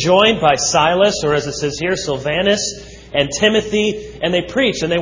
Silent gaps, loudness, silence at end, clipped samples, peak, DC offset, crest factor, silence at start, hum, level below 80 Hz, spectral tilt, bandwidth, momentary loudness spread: none; -16 LUFS; 0 s; under 0.1%; 0 dBFS; under 0.1%; 16 dB; 0 s; none; -42 dBFS; -3.5 dB/octave; 7.6 kHz; 8 LU